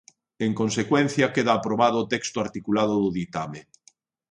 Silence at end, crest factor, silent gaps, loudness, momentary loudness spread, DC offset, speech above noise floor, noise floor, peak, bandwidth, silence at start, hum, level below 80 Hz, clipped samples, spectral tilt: 0.7 s; 18 dB; none; -24 LUFS; 10 LU; under 0.1%; 37 dB; -61 dBFS; -6 dBFS; 10.5 kHz; 0.4 s; none; -60 dBFS; under 0.1%; -5 dB/octave